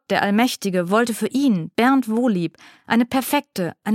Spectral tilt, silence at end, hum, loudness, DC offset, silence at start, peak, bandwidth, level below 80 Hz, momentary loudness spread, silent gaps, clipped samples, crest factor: -5 dB/octave; 0 s; none; -20 LUFS; under 0.1%; 0.1 s; -2 dBFS; 16.5 kHz; -64 dBFS; 6 LU; none; under 0.1%; 18 dB